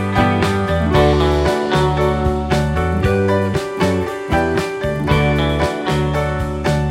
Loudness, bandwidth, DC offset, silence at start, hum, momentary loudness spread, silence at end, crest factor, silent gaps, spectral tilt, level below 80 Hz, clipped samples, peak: -17 LUFS; 15.5 kHz; under 0.1%; 0 s; none; 5 LU; 0 s; 14 dB; none; -6.5 dB/octave; -26 dBFS; under 0.1%; -2 dBFS